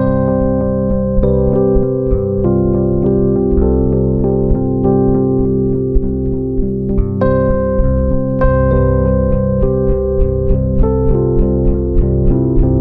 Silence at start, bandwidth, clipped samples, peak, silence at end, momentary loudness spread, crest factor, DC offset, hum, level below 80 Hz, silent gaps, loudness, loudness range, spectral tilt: 0 s; 2.8 kHz; under 0.1%; 0 dBFS; 0 s; 3 LU; 12 dB; under 0.1%; none; -18 dBFS; none; -14 LUFS; 1 LU; -13.5 dB/octave